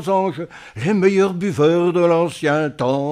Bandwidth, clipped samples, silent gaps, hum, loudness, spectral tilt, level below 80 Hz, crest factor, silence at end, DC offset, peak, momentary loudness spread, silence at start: 12 kHz; under 0.1%; none; none; -18 LUFS; -7 dB/octave; -60 dBFS; 14 dB; 0 s; under 0.1%; -2 dBFS; 9 LU; 0 s